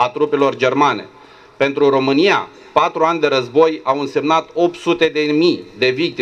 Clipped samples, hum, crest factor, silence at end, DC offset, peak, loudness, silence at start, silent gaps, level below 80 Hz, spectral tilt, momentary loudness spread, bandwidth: under 0.1%; none; 16 dB; 0 s; under 0.1%; 0 dBFS; -16 LUFS; 0 s; none; -58 dBFS; -5.5 dB/octave; 5 LU; 9.4 kHz